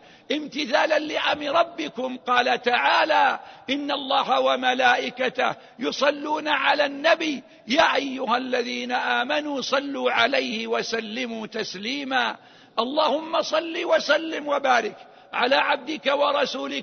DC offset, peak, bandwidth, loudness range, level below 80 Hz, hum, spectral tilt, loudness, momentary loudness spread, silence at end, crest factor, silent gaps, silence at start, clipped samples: under 0.1%; -4 dBFS; 6.6 kHz; 3 LU; -68 dBFS; none; -2.5 dB/octave; -23 LUFS; 9 LU; 0 s; 20 dB; none; 0.3 s; under 0.1%